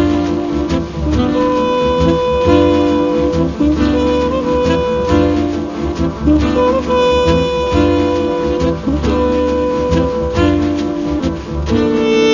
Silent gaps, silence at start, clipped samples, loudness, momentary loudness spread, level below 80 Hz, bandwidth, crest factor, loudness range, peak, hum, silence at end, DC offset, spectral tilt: none; 0 s; under 0.1%; -14 LUFS; 6 LU; -24 dBFS; 7.4 kHz; 14 dB; 2 LU; 0 dBFS; none; 0 s; under 0.1%; -7 dB/octave